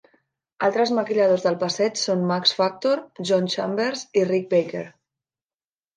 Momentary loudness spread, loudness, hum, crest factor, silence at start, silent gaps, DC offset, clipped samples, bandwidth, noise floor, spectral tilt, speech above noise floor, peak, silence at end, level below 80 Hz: 5 LU; -22 LUFS; none; 18 dB; 0.6 s; none; under 0.1%; under 0.1%; 9.8 kHz; under -90 dBFS; -4.5 dB/octave; over 68 dB; -6 dBFS; 1.05 s; -74 dBFS